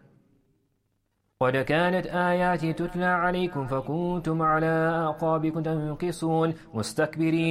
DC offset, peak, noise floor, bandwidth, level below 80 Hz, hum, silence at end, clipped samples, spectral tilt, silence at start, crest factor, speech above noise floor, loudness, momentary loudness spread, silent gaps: under 0.1%; -12 dBFS; -74 dBFS; 13.5 kHz; -52 dBFS; none; 0 s; under 0.1%; -6.5 dB/octave; 1.4 s; 16 dB; 48 dB; -26 LUFS; 6 LU; none